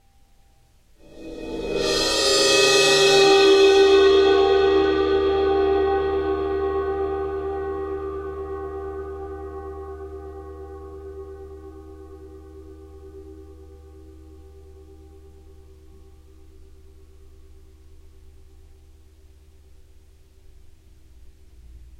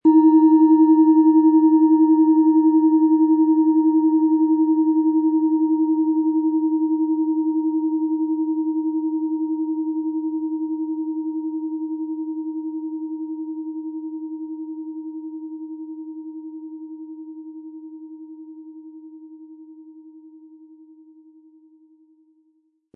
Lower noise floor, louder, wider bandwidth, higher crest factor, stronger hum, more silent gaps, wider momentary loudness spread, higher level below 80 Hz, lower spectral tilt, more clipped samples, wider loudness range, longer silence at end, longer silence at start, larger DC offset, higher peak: second, -55 dBFS vs -65 dBFS; about the same, -19 LUFS vs -19 LUFS; first, 13.5 kHz vs 1.9 kHz; about the same, 18 dB vs 14 dB; neither; neither; first, 27 LU vs 22 LU; first, -44 dBFS vs -82 dBFS; second, -3 dB/octave vs -12 dB/octave; neither; about the same, 24 LU vs 22 LU; second, 0.15 s vs 2.6 s; first, 1.15 s vs 0.05 s; neither; about the same, -4 dBFS vs -6 dBFS